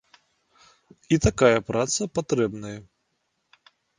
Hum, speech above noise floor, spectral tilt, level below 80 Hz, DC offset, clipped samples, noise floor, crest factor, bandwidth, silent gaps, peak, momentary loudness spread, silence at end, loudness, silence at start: none; 52 dB; -5 dB/octave; -44 dBFS; under 0.1%; under 0.1%; -75 dBFS; 22 dB; 10 kHz; none; -4 dBFS; 18 LU; 1.15 s; -23 LUFS; 1.1 s